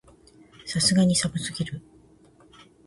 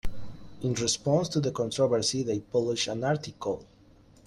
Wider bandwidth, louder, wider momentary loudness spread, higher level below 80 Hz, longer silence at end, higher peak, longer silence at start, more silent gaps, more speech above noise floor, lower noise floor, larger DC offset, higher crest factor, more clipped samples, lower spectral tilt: second, 11.5 kHz vs 13.5 kHz; first, -24 LUFS vs -28 LUFS; first, 18 LU vs 11 LU; second, -54 dBFS vs -48 dBFS; first, 1.1 s vs 0.6 s; first, -8 dBFS vs -12 dBFS; first, 0.65 s vs 0.05 s; neither; about the same, 32 dB vs 29 dB; about the same, -55 dBFS vs -57 dBFS; neither; about the same, 20 dB vs 18 dB; neither; about the same, -4 dB/octave vs -4.5 dB/octave